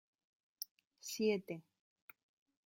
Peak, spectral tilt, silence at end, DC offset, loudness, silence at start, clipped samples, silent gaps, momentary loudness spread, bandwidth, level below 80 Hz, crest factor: -22 dBFS; -4 dB/octave; 1.05 s; under 0.1%; -42 LUFS; 0.6 s; under 0.1%; 0.71-0.77 s, 0.87-0.91 s; 25 LU; 16.5 kHz; -88 dBFS; 22 dB